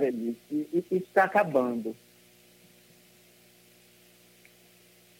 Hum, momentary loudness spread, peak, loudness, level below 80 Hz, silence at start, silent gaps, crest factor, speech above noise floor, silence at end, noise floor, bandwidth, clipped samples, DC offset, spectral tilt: 60 Hz at -60 dBFS; 12 LU; -8 dBFS; -28 LUFS; -78 dBFS; 0 s; none; 22 dB; 31 dB; 3.25 s; -59 dBFS; 16.5 kHz; under 0.1%; under 0.1%; -6.5 dB/octave